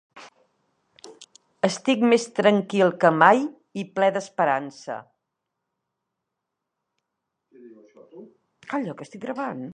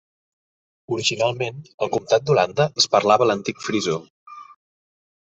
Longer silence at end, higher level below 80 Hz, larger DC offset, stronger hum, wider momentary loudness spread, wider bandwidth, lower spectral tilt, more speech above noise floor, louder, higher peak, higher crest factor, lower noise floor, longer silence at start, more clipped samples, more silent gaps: second, 0 s vs 0.9 s; second, -78 dBFS vs -62 dBFS; neither; neither; first, 18 LU vs 11 LU; first, 10 kHz vs 8.4 kHz; about the same, -5 dB/octave vs -4 dB/octave; second, 61 dB vs over 70 dB; about the same, -22 LUFS vs -21 LUFS; about the same, -2 dBFS vs -2 dBFS; about the same, 24 dB vs 20 dB; second, -83 dBFS vs under -90 dBFS; second, 0.15 s vs 0.9 s; neither; second, none vs 1.74-1.78 s, 4.10-4.26 s